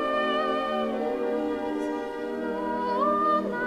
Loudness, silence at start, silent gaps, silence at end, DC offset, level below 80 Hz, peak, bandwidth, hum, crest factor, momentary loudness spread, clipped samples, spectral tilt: -27 LUFS; 0 s; none; 0 s; under 0.1%; -58 dBFS; -12 dBFS; 14 kHz; none; 14 dB; 7 LU; under 0.1%; -5.5 dB/octave